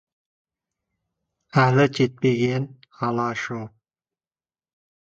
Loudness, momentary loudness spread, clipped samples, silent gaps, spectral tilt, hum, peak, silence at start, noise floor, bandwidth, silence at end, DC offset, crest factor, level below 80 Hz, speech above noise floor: -22 LUFS; 15 LU; under 0.1%; none; -7 dB/octave; none; -4 dBFS; 1.55 s; under -90 dBFS; 7.8 kHz; 1.45 s; under 0.1%; 22 dB; -62 dBFS; over 69 dB